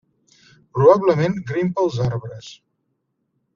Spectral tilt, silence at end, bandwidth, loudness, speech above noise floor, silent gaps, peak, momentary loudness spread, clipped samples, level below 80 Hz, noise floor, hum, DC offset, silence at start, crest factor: -7 dB/octave; 1 s; 7.4 kHz; -18 LUFS; 54 dB; none; -2 dBFS; 17 LU; under 0.1%; -54 dBFS; -72 dBFS; none; under 0.1%; 0.75 s; 20 dB